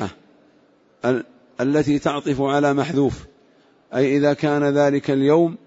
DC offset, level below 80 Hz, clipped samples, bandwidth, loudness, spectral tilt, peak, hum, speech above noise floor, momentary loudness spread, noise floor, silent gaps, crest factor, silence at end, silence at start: under 0.1%; -52 dBFS; under 0.1%; 8 kHz; -20 LUFS; -7 dB/octave; -6 dBFS; none; 38 dB; 9 LU; -57 dBFS; none; 16 dB; 0.1 s; 0 s